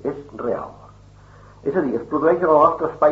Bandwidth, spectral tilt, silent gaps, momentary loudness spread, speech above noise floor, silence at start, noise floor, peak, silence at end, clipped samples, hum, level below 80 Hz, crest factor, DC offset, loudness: 7.4 kHz; -7 dB/octave; none; 14 LU; 27 dB; 0.05 s; -46 dBFS; -2 dBFS; 0 s; under 0.1%; 50 Hz at -50 dBFS; -52 dBFS; 18 dB; under 0.1%; -20 LUFS